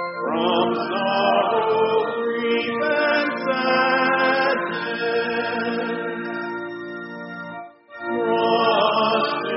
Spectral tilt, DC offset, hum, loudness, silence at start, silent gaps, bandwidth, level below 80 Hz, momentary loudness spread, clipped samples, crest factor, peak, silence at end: -1.5 dB/octave; under 0.1%; none; -21 LUFS; 0 s; none; 5.8 kHz; -68 dBFS; 14 LU; under 0.1%; 16 dB; -6 dBFS; 0 s